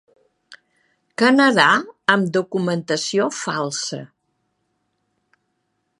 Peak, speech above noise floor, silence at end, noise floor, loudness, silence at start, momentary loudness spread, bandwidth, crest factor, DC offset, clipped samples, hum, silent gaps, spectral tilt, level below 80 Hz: 0 dBFS; 54 dB; 1.95 s; -72 dBFS; -18 LUFS; 0.5 s; 12 LU; 11.5 kHz; 22 dB; under 0.1%; under 0.1%; none; none; -4 dB/octave; -72 dBFS